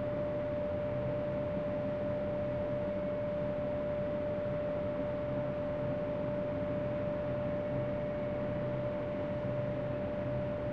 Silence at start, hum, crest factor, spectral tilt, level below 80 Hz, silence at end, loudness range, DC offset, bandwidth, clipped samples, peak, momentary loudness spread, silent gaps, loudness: 0 s; none; 12 dB; -9.5 dB/octave; -54 dBFS; 0 s; 0 LU; 0.1%; 5.6 kHz; under 0.1%; -24 dBFS; 1 LU; none; -36 LUFS